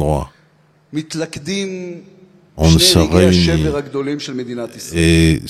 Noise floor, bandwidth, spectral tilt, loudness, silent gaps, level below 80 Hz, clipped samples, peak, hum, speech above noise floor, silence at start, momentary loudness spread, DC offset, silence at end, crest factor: -53 dBFS; 15.5 kHz; -5 dB/octave; -15 LUFS; none; -32 dBFS; under 0.1%; 0 dBFS; none; 38 dB; 0 s; 17 LU; under 0.1%; 0 s; 16 dB